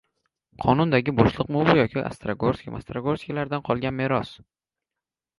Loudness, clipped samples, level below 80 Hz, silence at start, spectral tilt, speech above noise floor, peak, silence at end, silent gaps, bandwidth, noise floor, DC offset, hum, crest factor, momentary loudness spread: -24 LUFS; under 0.1%; -48 dBFS; 0.6 s; -8 dB/octave; 65 dB; -2 dBFS; 1.05 s; none; 11.5 kHz; -88 dBFS; under 0.1%; none; 24 dB; 10 LU